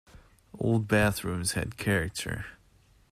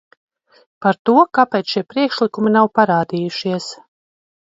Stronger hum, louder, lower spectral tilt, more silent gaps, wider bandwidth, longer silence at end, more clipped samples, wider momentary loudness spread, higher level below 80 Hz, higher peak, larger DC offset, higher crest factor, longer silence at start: neither; second, -29 LUFS vs -17 LUFS; about the same, -5 dB/octave vs -6 dB/octave; second, none vs 0.99-1.05 s; first, 15 kHz vs 7.8 kHz; second, 0.55 s vs 0.75 s; neither; first, 11 LU vs 8 LU; first, -50 dBFS vs -66 dBFS; second, -12 dBFS vs 0 dBFS; neither; about the same, 18 dB vs 18 dB; second, 0.15 s vs 0.8 s